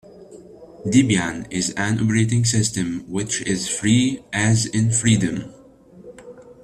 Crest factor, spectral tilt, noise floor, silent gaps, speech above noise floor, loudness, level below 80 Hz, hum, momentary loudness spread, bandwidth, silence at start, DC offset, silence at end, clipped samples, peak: 18 dB; -4.5 dB/octave; -46 dBFS; none; 26 dB; -20 LUFS; -50 dBFS; none; 9 LU; 13 kHz; 0.15 s; under 0.1%; 0.1 s; under 0.1%; -4 dBFS